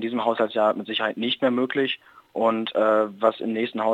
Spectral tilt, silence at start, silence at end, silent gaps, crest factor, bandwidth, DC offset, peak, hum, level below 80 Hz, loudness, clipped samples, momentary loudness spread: -6.5 dB/octave; 0 s; 0 s; none; 18 dB; 9 kHz; under 0.1%; -6 dBFS; none; -78 dBFS; -23 LUFS; under 0.1%; 6 LU